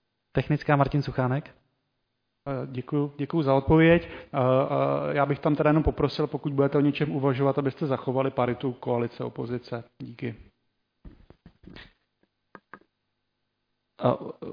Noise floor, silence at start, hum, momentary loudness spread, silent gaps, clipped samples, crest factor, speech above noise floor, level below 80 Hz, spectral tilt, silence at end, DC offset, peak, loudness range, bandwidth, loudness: -79 dBFS; 0.35 s; 50 Hz at -55 dBFS; 12 LU; none; under 0.1%; 20 dB; 53 dB; -48 dBFS; -9.5 dB/octave; 0 s; under 0.1%; -8 dBFS; 15 LU; 5.2 kHz; -26 LUFS